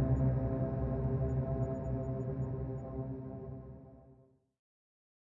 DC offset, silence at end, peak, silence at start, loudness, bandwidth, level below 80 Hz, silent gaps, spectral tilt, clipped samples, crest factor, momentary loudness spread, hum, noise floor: under 0.1%; 1.15 s; -22 dBFS; 0 s; -37 LUFS; 2.7 kHz; -46 dBFS; none; -12.5 dB/octave; under 0.1%; 14 dB; 15 LU; none; -64 dBFS